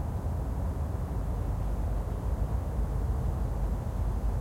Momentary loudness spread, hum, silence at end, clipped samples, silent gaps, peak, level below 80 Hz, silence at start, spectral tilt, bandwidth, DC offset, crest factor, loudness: 2 LU; none; 0 s; under 0.1%; none; -20 dBFS; -32 dBFS; 0 s; -8.5 dB/octave; 15.5 kHz; under 0.1%; 10 dB; -33 LUFS